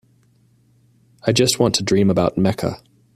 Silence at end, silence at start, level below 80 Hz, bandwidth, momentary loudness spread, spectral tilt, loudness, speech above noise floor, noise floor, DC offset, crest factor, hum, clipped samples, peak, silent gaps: 0.4 s; 1.25 s; -50 dBFS; 14.5 kHz; 10 LU; -5 dB/octave; -18 LUFS; 40 dB; -57 dBFS; under 0.1%; 18 dB; none; under 0.1%; -2 dBFS; none